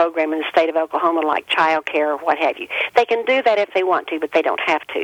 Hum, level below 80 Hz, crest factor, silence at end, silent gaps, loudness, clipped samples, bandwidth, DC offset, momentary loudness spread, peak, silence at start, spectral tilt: none; -68 dBFS; 16 dB; 0 s; none; -18 LUFS; under 0.1%; 15.5 kHz; under 0.1%; 4 LU; -2 dBFS; 0 s; -3.5 dB/octave